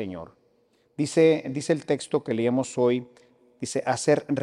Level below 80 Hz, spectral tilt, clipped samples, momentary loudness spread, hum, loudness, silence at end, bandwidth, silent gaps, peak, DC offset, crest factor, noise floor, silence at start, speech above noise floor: -68 dBFS; -5.5 dB/octave; under 0.1%; 14 LU; none; -25 LUFS; 0 s; 11 kHz; none; -8 dBFS; under 0.1%; 18 dB; -65 dBFS; 0 s; 41 dB